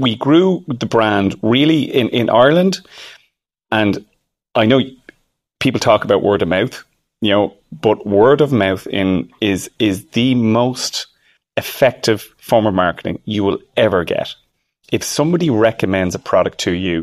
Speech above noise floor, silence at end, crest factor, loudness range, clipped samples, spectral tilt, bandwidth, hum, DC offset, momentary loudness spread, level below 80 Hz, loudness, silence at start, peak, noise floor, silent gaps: 49 dB; 0 s; 16 dB; 3 LU; under 0.1%; -5.5 dB/octave; 15 kHz; none; under 0.1%; 10 LU; -50 dBFS; -16 LUFS; 0 s; 0 dBFS; -64 dBFS; none